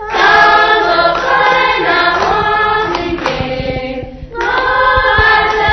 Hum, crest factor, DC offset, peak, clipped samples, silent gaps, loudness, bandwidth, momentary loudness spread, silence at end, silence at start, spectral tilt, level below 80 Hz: none; 12 dB; under 0.1%; 0 dBFS; under 0.1%; none; -11 LUFS; 6.4 kHz; 12 LU; 0 s; 0 s; -4.5 dB/octave; -30 dBFS